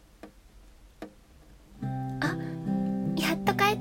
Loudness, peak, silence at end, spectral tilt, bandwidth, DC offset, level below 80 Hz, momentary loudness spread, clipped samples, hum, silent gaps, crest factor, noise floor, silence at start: -30 LUFS; -10 dBFS; 0 s; -5.5 dB/octave; 16.5 kHz; under 0.1%; -54 dBFS; 22 LU; under 0.1%; none; none; 20 dB; -54 dBFS; 0.25 s